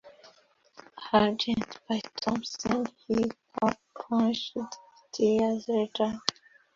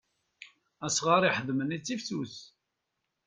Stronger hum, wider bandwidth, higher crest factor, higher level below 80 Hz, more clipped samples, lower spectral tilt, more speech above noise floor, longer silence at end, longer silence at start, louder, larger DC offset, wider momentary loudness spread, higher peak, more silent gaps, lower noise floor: neither; second, 7.4 kHz vs 10 kHz; first, 28 dB vs 22 dB; first, -62 dBFS vs -72 dBFS; neither; first, -5 dB/octave vs -3.5 dB/octave; second, 34 dB vs 54 dB; second, 0.45 s vs 0.8 s; second, 0.05 s vs 0.4 s; about the same, -29 LUFS vs -29 LUFS; neither; second, 12 LU vs 16 LU; first, -2 dBFS vs -10 dBFS; neither; second, -62 dBFS vs -83 dBFS